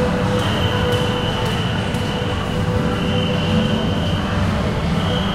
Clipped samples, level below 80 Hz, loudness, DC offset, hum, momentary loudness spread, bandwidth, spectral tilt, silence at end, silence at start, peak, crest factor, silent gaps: under 0.1%; -32 dBFS; -19 LUFS; under 0.1%; none; 3 LU; 15 kHz; -6 dB/octave; 0 s; 0 s; -6 dBFS; 12 dB; none